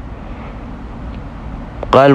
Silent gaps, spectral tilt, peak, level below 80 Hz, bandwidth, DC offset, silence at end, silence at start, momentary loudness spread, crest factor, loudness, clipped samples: none; -7.5 dB/octave; 0 dBFS; -30 dBFS; 10 kHz; under 0.1%; 0 s; 0 s; 17 LU; 16 dB; -21 LUFS; under 0.1%